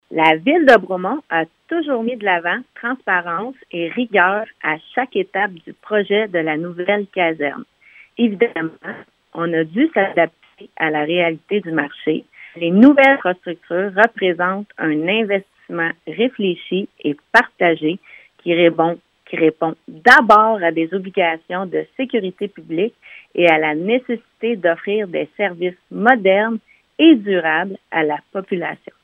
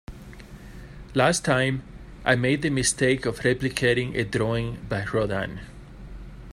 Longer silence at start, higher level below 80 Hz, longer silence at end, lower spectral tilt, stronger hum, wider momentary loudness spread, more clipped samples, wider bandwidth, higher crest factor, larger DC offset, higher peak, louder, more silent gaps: about the same, 0.1 s vs 0.1 s; second, -64 dBFS vs -44 dBFS; first, 0.3 s vs 0.05 s; first, -6.5 dB/octave vs -4.5 dB/octave; neither; second, 13 LU vs 22 LU; neither; second, 10.5 kHz vs 15 kHz; about the same, 18 dB vs 20 dB; neither; first, 0 dBFS vs -4 dBFS; first, -17 LUFS vs -24 LUFS; neither